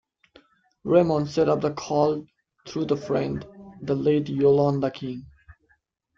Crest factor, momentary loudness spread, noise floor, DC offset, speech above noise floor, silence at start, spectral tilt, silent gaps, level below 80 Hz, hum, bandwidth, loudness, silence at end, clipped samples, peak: 18 dB; 15 LU; -68 dBFS; under 0.1%; 45 dB; 0.85 s; -7.5 dB/octave; none; -58 dBFS; none; 7.4 kHz; -24 LUFS; 0.65 s; under 0.1%; -6 dBFS